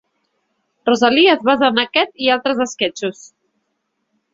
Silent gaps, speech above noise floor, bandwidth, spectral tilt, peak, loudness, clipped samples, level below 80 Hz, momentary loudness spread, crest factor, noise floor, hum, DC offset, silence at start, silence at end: none; 56 dB; 7.8 kHz; -3 dB/octave; 0 dBFS; -16 LUFS; under 0.1%; -62 dBFS; 10 LU; 18 dB; -71 dBFS; none; under 0.1%; 0.85 s; 1.2 s